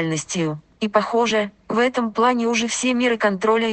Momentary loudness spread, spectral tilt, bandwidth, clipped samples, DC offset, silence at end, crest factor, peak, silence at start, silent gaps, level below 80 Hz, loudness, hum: 6 LU; -4 dB/octave; 9 kHz; under 0.1%; under 0.1%; 0 s; 16 dB; -4 dBFS; 0 s; none; -58 dBFS; -20 LUFS; none